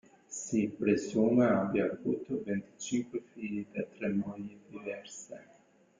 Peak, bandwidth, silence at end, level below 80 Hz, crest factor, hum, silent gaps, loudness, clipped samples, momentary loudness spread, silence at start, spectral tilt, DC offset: -14 dBFS; 9.4 kHz; 0.55 s; -70 dBFS; 18 dB; none; none; -33 LUFS; under 0.1%; 17 LU; 0.3 s; -6 dB/octave; under 0.1%